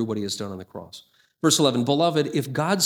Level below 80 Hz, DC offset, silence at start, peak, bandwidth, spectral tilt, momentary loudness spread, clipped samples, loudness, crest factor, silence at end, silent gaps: -68 dBFS; under 0.1%; 0 s; -4 dBFS; 19.5 kHz; -4 dB/octave; 19 LU; under 0.1%; -22 LUFS; 20 dB; 0 s; none